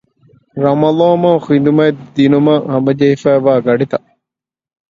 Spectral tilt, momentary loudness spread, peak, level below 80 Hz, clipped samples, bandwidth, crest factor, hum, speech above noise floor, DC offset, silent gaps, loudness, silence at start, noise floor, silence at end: -8.5 dB/octave; 6 LU; 0 dBFS; -54 dBFS; under 0.1%; 7.6 kHz; 12 dB; none; 74 dB; under 0.1%; none; -12 LUFS; 0.55 s; -85 dBFS; 0.95 s